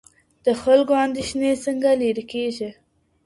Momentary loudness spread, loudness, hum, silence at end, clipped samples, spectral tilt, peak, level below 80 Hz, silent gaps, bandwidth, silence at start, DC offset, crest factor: 10 LU; -21 LUFS; none; 0.55 s; under 0.1%; -4.5 dB/octave; -4 dBFS; -56 dBFS; none; 11.5 kHz; 0.45 s; under 0.1%; 18 dB